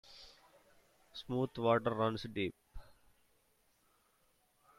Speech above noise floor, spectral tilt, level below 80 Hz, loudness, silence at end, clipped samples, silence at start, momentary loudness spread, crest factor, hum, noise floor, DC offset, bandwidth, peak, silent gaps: 39 dB; -7 dB/octave; -64 dBFS; -36 LUFS; 1.95 s; under 0.1%; 0.1 s; 23 LU; 24 dB; none; -74 dBFS; under 0.1%; 15.5 kHz; -18 dBFS; none